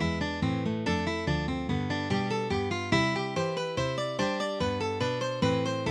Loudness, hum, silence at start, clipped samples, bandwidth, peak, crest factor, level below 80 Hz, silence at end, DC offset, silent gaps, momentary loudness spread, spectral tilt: -29 LUFS; none; 0 s; under 0.1%; 11.5 kHz; -12 dBFS; 18 dB; -48 dBFS; 0 s; under 0.1%; none; 3 LU; -5.5 dB/octave